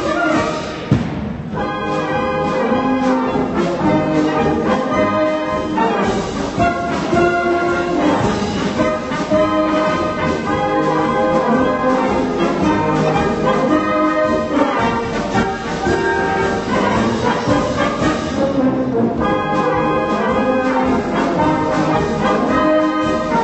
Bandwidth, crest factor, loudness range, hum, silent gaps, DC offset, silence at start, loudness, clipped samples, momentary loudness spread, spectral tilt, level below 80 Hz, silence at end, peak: 8.4 kHz; 14 dB; 1 LU; none; none; under 0.1%; 0 s; -17 LUFS; under 0.1%; 4 LU; -6 dB/octave; -38 dBFS; 0 s; -2 dBFS